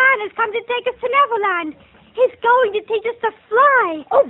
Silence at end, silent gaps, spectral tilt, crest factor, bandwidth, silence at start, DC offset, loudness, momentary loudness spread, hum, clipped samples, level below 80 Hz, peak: 0 s; none; -5 dB/octave; 16 dB; 4.1 kHz; 0 s; under 0.1%; -17 LUFS; 10 LU; none; under 0.1%; -62 dBFS; -2 dBFS